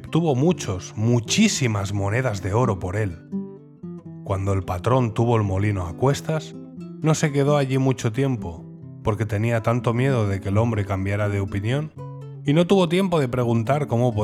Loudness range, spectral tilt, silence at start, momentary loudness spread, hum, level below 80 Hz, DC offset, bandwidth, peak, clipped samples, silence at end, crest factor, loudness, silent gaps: 2 LU; -6 dB/octave; 0 s; 15 LU; none; -52 dBFS; under 0.1%; 14 kHz; -6 dBFS; under 0.1%; 0 s; 16 dB; -22 LUFS; none